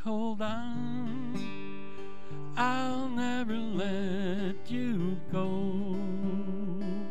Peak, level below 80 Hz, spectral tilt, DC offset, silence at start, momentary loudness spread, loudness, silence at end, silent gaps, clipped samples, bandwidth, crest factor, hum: -16 dBFS; -66 dBFS; -7 dB/octave; 3%; 0 s; 10 LU; -34 LUFS; 0 s; none; under 0.1%; 8.8 kHz; 18 dB; none